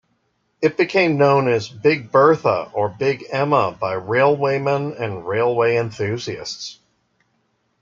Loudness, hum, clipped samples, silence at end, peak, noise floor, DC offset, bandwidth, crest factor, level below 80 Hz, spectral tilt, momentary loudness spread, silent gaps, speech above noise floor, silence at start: -19 LUFS; none; under 0.1%; 1.1 s; -2 dBFS; -67 dBFS; under 0.1%; 7.6 kHz; 18 dB; -62 dBFS; -6 dB/octave; 11 LU; none; 49 dB; 0.6 s